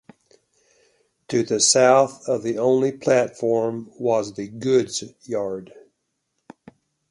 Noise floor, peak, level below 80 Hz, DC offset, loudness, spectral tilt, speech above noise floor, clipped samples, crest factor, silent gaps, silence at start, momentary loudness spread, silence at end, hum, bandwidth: -75 dBFS; -4 dBFS; -66 dBFS; under 0.1%; -21 LUFS; -3.5 dB/octave; 54 dB; under 0.1%; 20 dB; none; 1.3 s; 14 LU; 1.45 s; none; 11.5 kHz